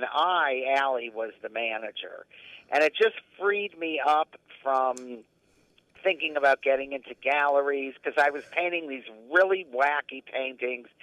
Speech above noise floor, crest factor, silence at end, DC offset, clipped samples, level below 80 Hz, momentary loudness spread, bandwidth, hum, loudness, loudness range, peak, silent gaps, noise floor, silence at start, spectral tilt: 37 dB; 20 dB; 0.2 s; under 0.1%; under 0.1%; -78 dBFS; 14 LU; 12 kHz; none; -27 LUFS; 2 LU; -8 dBFS; none; -65 dBFS; 0 s; -3 dB/octave